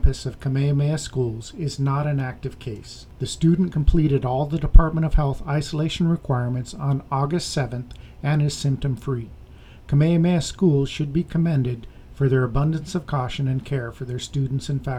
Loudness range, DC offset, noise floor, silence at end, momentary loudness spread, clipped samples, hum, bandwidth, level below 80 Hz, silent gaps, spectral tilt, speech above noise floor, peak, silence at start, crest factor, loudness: 3 LU; under 0.1%; -43 dBFS; 0 s; 11 LU; under 0.1%; none; 11.5 kHz; -26 dBFS; none; -7 dB/octave; 22 dB; 0 dBFS; 0 s; 22 dB; -23 LUFS